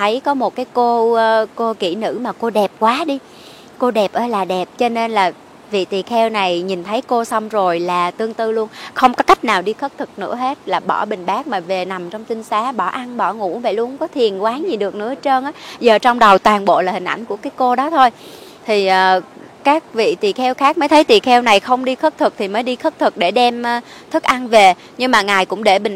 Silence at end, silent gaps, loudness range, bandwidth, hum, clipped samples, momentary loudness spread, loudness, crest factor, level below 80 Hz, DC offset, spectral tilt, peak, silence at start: 0 s; none; 6 LU; 16 kHz; none; under 0.1%; 10 LU; -16 LUFS; 16 dB; -56 dBFS; under 0.1%; -4 dB/octave; 0 dBFS; 0 s